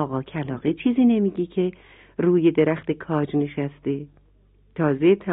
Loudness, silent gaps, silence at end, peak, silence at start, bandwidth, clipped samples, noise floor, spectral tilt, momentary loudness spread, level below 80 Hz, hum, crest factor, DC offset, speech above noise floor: -23 LUFS; none; 0 s; -6 dBFS; 0 s; 3.9 kHz; under 0.1%; -57 dBFS; -11.5 dB/octave; 11 LU; -56 dBFS; none; 16 dB; under 0.1%; 35 dB